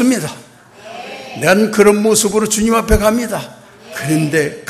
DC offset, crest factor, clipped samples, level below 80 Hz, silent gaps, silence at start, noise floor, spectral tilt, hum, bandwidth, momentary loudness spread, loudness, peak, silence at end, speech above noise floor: under 0.1%; 14 dB; under 0.1%; -30 dBFS; none; 0 s; -39 dBFS; -4.5 dB/octave; none; 14 kHz; 19 LU; -14 LUFS; 0 dBFS; 0.1 s; 26 dB